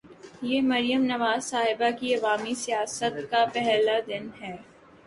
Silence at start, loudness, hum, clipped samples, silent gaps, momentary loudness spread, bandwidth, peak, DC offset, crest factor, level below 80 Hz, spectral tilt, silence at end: 0.05 s; -26 LUFS; none; under 0.1%; none; 12 LU; 11.5 kHz; -10 dBFS; under 0.1%; 16 dB; -68 dBFS; -3 dB/octave; 0.45 s